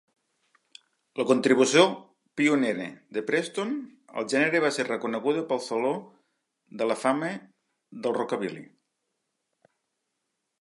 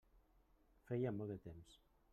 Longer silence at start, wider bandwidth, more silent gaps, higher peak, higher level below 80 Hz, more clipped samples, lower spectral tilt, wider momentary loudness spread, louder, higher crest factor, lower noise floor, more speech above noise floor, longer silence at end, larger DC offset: first, 1.15 s vs 0.15 s; second, 11.5 kHz vs 13 kHz; neither; first, -6 dBFS vs -32 dBFS; second, -82 dBFS vs -72 dBFS; neither; second, -4 dB/octave vs -9 dB/octave; about the same, 15 LU vs 16 LU; first, -26 LUFS vs -46 LUFS; about the same, 22 dB vs 18 dB; first, -81 dBFS vs -74 dBFS; first, 55 dB vs 28 dB; first, 1.95 s vs 0.35 s; neither